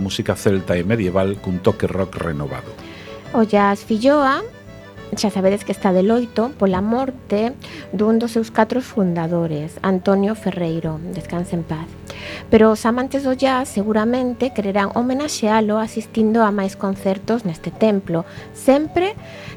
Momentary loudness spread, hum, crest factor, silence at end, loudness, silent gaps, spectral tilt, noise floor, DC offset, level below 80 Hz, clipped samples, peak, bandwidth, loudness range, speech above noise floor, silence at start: 13 LU; none; 18 dB; 0 s; -19 LUFS; none; -6 dB/octave; -38 dBFS; under 0.1%; -46 dBFS; under 0.1%; 0 dBFS; 19 kHz; 3 LU; 19 dB; 0 s